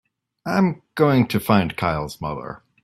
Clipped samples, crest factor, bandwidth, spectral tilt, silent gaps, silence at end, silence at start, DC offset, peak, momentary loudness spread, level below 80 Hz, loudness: under 0.1%; 20 dB; 16 kHz; -7 dB/octave; none; 0.25 s; 0.45 s; under 0.1%; -2 dBFS; 14 LU; -50 dBFS; -21 LUFS